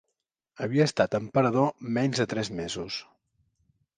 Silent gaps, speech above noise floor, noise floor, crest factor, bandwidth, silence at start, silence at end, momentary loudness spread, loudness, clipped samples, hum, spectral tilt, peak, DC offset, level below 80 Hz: none; 57 dB; -83 dBFS; 20 dB; 9.8 kHz; 0.6 s; 0.95 s; 11 LU; -27 LUFS; under 0.1%; none; -5.5 dB/octave; -8 dBFS; under 0.1%; -62 dBFS